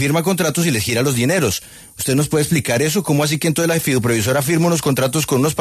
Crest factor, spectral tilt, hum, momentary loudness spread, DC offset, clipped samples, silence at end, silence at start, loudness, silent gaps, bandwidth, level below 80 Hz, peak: 12 dB; -4.5 dB/octave; none; 2 LU; under 0.1%; under 0.1%; 0 s; 0 s; -17 LUFS; none; 14 kHz; -48 dBFS; -4 dBFS